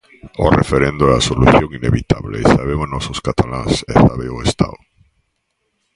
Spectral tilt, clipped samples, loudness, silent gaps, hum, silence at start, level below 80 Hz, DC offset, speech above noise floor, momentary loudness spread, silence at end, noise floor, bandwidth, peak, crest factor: -6 dB/octave; under 0.1%; -15 LUFS; none; none; 0.25 s; -28 dBFS; under 0.1%; 55 dB; 9 LU; 1.2 s; -69 dBFS; 11.5 kHz; 0 dBFS; 16 dB